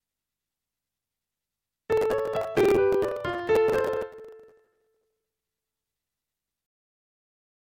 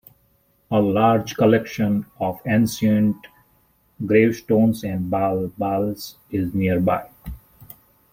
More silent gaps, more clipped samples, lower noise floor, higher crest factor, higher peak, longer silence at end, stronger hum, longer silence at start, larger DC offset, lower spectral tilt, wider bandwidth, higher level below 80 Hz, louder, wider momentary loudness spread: neither; neither; first, -88 dBFS vs -62 dBFS; about the same, 18 dB vs 18 dB; second, -12 dBFS vs -2 dBFS; first, 3.25 s vs 0.75 s; neither; first, 1.9 s vs 0.7 s; neither; about the same, -6 dB/octave vs -7 dB/octave; about the same, 16.5 kHz vs 16.5 kHz; second, -56 dBFS vs -50 dBFS; second, -25 LUFS vs -21 LUFS; about the same, 10 LU vs 11 LU